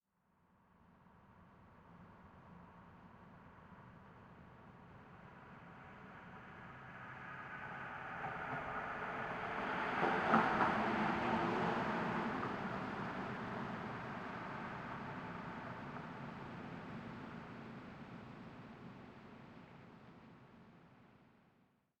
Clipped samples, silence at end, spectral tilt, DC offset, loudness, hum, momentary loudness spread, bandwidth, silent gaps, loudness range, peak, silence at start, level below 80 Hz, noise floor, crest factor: under 0.1%; 0.75 s; -6.5 dB/octave; under 0.1%; -41 LUFS; none; 23 LU; 10.5 kHz; none; 23 LU; -16 dBFS; 0.8 s; -70 dBFS; -77 dBFS; 28 dB